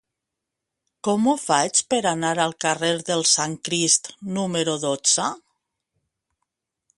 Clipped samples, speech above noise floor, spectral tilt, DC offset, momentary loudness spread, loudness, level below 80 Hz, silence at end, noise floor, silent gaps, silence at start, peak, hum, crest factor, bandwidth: under 0.1%; 61 dB; -2.5 dB/octave; under 0.1%; 8 LU; -21 LUFS; -68 dBFS; 1.6 s; -83 dBFS; none; 1.05 s; -4 dBFS; none; 20 dB; 11.5 kHz